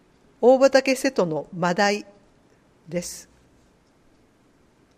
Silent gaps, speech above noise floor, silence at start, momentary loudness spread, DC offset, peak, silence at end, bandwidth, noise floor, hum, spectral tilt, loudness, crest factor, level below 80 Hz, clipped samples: none; 39 dB; 0.4 s; 15 LU; under 0.1%; -4 dBFS; 1.75 s; 15.5 kHz; -59 dBFS; none; -4.5 dB/octave; -21 LUFS; 20 dB; -62 dBFS; under 0.1%